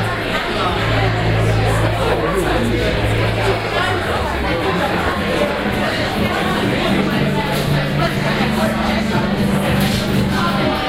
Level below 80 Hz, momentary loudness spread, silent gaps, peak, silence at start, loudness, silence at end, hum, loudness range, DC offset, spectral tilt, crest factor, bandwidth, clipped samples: -30 dBFS; 2 LU; none; -2 dBFS; 0 s; -17 LUFS; 0 s; none; 1 LU; under 0.1%; -5.5 dB/octave; 14 dB; 16 kHz; under 0.1%